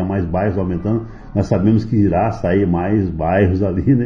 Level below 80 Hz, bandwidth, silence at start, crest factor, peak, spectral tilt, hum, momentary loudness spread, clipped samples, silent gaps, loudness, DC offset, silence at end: -36 dBFS; 7 kHz; 0 s; 14 dB; -2 dBFS; -9.5 dB/octave; none; 6 LU; under 0.1%; none; -17 LUFS; under 0.1%; 0 s